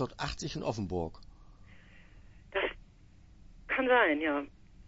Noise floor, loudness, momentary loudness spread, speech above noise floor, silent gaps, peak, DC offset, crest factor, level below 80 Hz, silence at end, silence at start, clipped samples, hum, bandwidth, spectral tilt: -57 dBFS; -32 LUFS; 14 LU; 26 dB; none; -12 dBFS; under 0.1%; 22 dB; -54 dBFS; 0.05 s; 0 s; under 0.1%; none; 8 kHz; -5 dB/octave